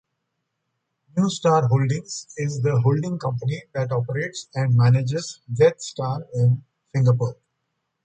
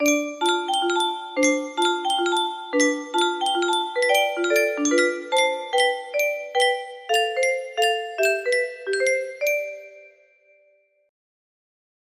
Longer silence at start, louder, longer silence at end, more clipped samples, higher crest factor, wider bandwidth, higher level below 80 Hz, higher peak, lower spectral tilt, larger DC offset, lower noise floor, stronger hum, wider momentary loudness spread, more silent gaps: first, 1.15 s vs 0 s; about the same, -22 LUFS vs -22 LUFS; second, 0.7 s vs 2 s; neither; about the same, 18 dB vs 18 dB; second, 8.8 kHz vs 15.5 kHz; first, -58 dBFS vs -72 dBFS; about the same, -4 dBFS vs -6 dBFS; first, -6.5 dB/octave vs 0 dB/octave; neither; first, -77 dBFS vs -62 dBFS; neither; first, 10 LU vs 4 LU; neither